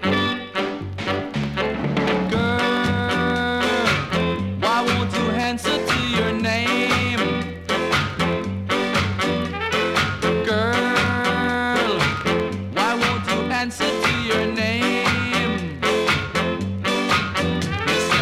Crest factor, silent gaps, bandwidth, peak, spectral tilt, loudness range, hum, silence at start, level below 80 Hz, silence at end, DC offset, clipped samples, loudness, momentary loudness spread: 16 dB; none; 16 kHz; -6 dBFS; -4.5 dB/octave; 1 LU; none; 0 s; -44 dBFS; 0 s; under 0.1%; under 0.1%; -21 LUFS; 5 LU